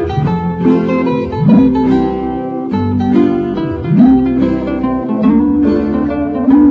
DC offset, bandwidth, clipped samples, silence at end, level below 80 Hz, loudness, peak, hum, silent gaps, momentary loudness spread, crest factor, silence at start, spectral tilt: under 0.1%; 5.2 kHz; under 0.1%; 0 s; -32 dBFS; -12 LUFS; 0 dBFS; none; none; 8 LU; 10 dB; 0 s; -10 dB/octave